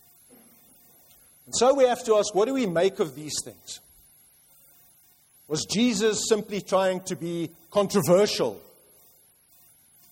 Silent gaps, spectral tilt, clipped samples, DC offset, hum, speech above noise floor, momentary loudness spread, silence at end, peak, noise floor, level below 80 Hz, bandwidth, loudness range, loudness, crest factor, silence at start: none; -4 dB/octave; under 0.1%; under 0.1%; none; 35 dB; 12 LU; 1.5 s; -8 dBFS; -59 dBFS; -64 dBFS; 16.5 kHz; 5 LU; -24 LUFS; 18 dB; 1.5 s